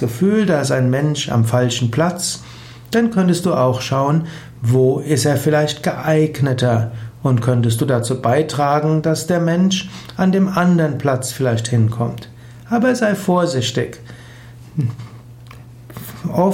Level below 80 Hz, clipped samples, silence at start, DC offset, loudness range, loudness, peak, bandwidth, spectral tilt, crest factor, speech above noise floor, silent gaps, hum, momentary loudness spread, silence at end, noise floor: -50 dBFS; under 0.1%; 0 s; under 0.1%; 4 LU; -17 LUFS; -4 dBFS; 16.5 kHz; -6 dB/octave; 14 dB; 22 dB; none; none; 13 LU; 0 s; -38 dBFS